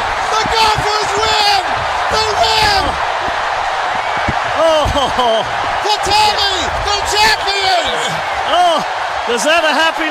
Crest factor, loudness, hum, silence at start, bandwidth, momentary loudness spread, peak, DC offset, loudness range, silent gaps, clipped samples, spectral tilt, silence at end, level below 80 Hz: 12 dB; -13 LUFS; none; 0 s; 16.5 kHz; 6 LU; -2 dBFS; under 0.1%; 1 LU; none; under 0.1%; -2 dB/octave; 0 s; -34 dBFS